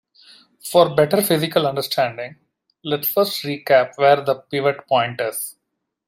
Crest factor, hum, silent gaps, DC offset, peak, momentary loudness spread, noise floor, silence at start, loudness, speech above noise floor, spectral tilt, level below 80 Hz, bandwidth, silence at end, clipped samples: 18 dB; none; none; under 0.1%; -2 dBFS; 13 LU; -77 dBFS; 0.65 s; -19 LUFS; 58 dB; -4.5 dB/octave; -64 dBFS; 16 kHz; 0.55 s; under 0.1%